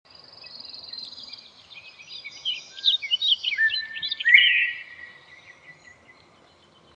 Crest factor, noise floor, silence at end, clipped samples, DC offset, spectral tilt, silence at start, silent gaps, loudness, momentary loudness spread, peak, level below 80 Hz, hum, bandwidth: 24 dB; -56 dBFS; 1.25 s; under 0.1%; under 0.1%; 1.5 dB/octave; 0.45 s; none; -20 LUFS; 28 LU; -2 dBFS; -74 dBFS; none; 8.6 kHz